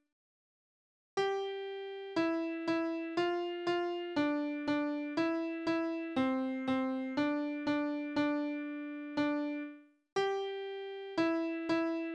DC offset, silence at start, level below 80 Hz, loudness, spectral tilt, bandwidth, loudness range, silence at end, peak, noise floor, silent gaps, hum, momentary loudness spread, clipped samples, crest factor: under 0.1%; 1.15 s; -76 dBFS; -35 LUFS; -5.5 dB/octave; 8.6 kHz; 2 LU; 0 s; -20 dBFS; under -90 dBFS; 10.12-10.16 s; none; 7 LU; under 0.1%; 16 dB